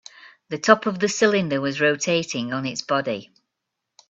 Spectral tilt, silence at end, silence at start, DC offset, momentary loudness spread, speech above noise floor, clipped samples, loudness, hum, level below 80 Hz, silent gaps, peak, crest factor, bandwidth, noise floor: -4 dB/octave; 0.85 s; 0.25 s; under 0.1%; 9 LU; 60 dB; under 0.1%; -21 LUFS; none; -66 dBFS; none; 0 dBFS; 22 dB; 8.2 kHz; -81 dBFS